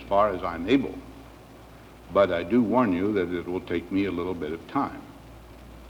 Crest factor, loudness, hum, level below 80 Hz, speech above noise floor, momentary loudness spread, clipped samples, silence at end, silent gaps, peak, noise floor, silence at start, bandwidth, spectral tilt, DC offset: 18 dB; -26 LUFS; none; -50 dBFS; 22 dB; 23 LU; under 0.1%; 0 s; none; -8 dBFS; -47 dBFS; 0 s; 19 kHz; -7.5 dB/octave; under 0.1%